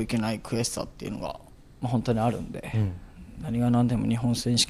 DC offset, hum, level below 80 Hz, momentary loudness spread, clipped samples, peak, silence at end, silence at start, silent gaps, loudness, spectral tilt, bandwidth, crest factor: under 0.1%; none; -48 dBFS; 13 LU; under 0.1%; -10 dBFS; 0 s; 0 s; none; -28 LUFS; -5 dB/octave; 15 kHz; 18 dB